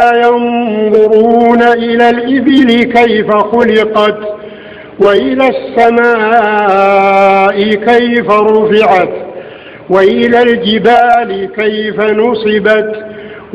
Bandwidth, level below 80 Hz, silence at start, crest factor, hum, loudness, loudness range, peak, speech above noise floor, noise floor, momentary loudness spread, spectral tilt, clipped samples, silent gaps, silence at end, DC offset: 8.2 kHz; -46 dBFS; 0 s; 8 dB; none; -8 LUFS; 2 LU; 0 dBFS; 20 dB; -28 dBFS; 12 LU; -6.5 dB/octave; 2%; none; 0 s; 0.1%